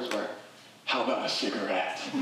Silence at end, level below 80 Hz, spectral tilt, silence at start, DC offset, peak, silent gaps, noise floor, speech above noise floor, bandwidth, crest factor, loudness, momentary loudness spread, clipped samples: 0 s; under -90 dBFS; -3 dB/octave; 0 s; under 0.1%; -14 dBFS; none; -51 dBFS; 20 dB; 15.5 kHz; 16 dB; -30 LUFS; 12 LU; under 0.1%